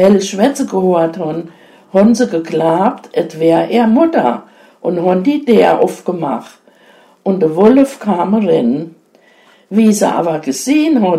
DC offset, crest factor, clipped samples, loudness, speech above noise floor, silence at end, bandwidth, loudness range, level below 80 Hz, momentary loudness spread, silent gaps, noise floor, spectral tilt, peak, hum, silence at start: under 0.1%; 12 dB; under 0.1%; -13 LUFS; 36 dB; 0 s; 15 kHz; 2 LU; -56 dBFS; 11 LU; none; -48 dBFS; -6 dB/octave; 0 dBFS; none; 0 s